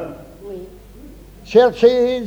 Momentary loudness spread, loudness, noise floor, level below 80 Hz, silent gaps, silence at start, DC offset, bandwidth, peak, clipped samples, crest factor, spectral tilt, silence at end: 22 LU; -14 LUFS; -39 dBFS; -44 dBFS; none; 0 s; under 0.1%; 7.8 kHz; -2 dBFS; under 0.1%; 16 dB; -5.5 dB/octave; 0 s